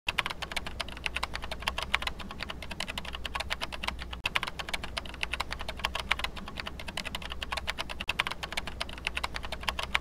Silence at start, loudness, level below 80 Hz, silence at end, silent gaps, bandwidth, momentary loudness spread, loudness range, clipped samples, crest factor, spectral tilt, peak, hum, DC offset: 0.05 s; -34 LUFS; -44 dBFS; 0 s; none; 16.5 kHz; 7 LU; 1 LU; under 0.1%; 28 dB; -2.5 dB/octave; -8 dBFS; none; under 0.1%